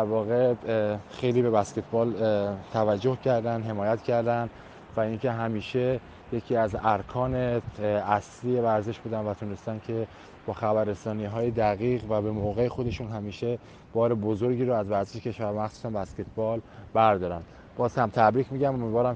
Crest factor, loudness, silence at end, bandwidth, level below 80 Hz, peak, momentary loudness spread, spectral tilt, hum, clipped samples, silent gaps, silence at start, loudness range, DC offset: 20 dB; -28 LUFS; 0 s; 8.8 kHz; -52 dBFS; -6 dBFS; 10 LU; -7.5 dB/octave; none; under 0.1%; none; 0 s; 3 LU; under 0.1%